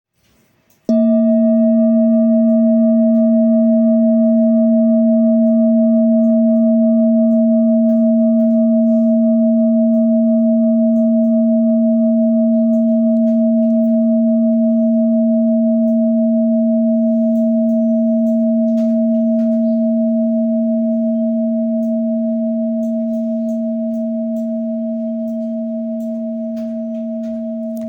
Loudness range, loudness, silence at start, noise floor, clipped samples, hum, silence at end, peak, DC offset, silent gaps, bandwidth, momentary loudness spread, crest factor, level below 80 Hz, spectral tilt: 7 LU; -14 LUFS; 0.9 s; -57 dBFS; under 0.1%; none; 0 s; -6 dBFS; under 0.1%; none; 1.3 kHz; 9 LU; 8 dB; -70 dBFS; -11.5 dB/octave